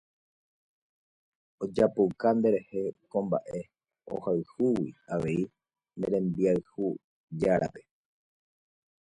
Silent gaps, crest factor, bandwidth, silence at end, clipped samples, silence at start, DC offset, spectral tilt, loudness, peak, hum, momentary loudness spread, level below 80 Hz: 7.04-7.28 s; 20 dB; 11 kHz; 1.25 s; under 0.1%; 1.6 s; under 0.1%; -8.5 dB/octave; -30 LUFS; -10 dBFS; none; 14 LU; -62 dBFS